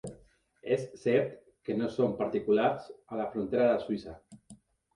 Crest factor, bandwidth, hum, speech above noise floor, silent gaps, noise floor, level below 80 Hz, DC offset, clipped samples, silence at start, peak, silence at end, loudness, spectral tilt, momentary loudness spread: 18 dB; 11 kHz; none; 31 dB; none; -61 dBFS; -64 dBFS; under 0.1%; under 0.1%; 0.05 s; -14 dBFS; 0.4 s; -31 LUFS; -7 dB/octave; 14 LU